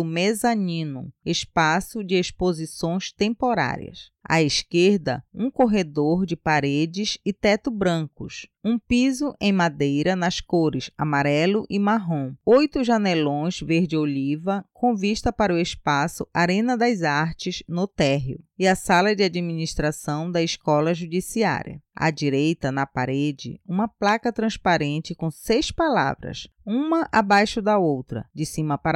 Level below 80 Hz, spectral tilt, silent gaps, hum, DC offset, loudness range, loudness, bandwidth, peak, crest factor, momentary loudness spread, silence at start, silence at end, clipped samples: -48 dBFS; -5.5 dB/octave; none; none; under 0.1%; 2 LU; -23 LUFS; 13.5 kHz; -8 dBFS; 14 dB; 8 LU; 0 s; 0 s; under 0.1%